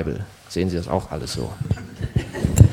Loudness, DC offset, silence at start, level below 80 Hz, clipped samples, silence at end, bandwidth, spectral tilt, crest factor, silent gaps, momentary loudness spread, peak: -25 LUFS; under 0.1%; 0 s; -32 dBFS; under 0.1%; 0 s; 17.5 kHz; -6.5 dB/octave; 20 dB; none; 6 LU; 0 dBFS